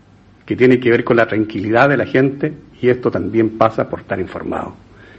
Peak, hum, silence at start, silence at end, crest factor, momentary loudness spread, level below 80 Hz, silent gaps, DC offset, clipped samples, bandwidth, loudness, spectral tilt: 0 dBFS; none; 0.45 s; 0.45 s; 16 dB; 11 LU; -46 dBFS; none; under 0.1%; under 0.1%; 7.6 kHz; -16 LUFS; -8.5 dB/octave